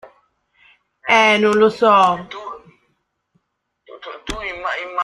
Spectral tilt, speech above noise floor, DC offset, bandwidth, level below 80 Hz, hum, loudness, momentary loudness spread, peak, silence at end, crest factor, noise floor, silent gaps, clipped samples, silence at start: -4 dB/octave; 56 dB; under 0.1%; 11.5 kHz; -48 dBFS; none; -15 LUFS; 22 LU; -2 dBFS; 0 s; 18 dB; -70 dBFS; none; under 0.1%; 1.05 s